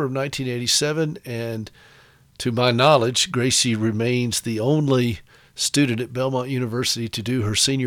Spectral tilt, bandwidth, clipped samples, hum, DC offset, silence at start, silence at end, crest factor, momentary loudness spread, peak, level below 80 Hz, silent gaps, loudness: -4 dB/octave; 18.5 kHz; under 0.1%; none; under 0.1%; 0 s; 0 s; 18 dB; 11 LU; -4 dBFS; -54 dBFS; none; -21 LUFS